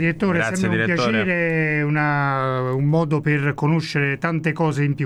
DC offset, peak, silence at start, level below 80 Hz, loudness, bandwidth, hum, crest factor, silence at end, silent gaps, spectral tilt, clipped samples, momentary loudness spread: under 0.1%; -6 dBFS; 0 s; -54 dBFS; -20 LUFS; 11.5 kHz; none; 14 dB; 0 s; none; -7 dB/octave; under 0.1%; 2 LU